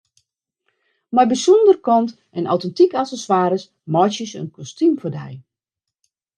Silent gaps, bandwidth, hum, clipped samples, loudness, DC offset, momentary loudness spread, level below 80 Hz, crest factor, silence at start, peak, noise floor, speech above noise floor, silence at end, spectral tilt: none; 9.8 kHz; none; under 0.1%; -18 LUFS; under 0.1%; 16 LU; -70 dBFS; 16 dB; 1.1 s; -2 dBFS; -84 dBFS; 67 dB; 0.95 s; -6 dB/octave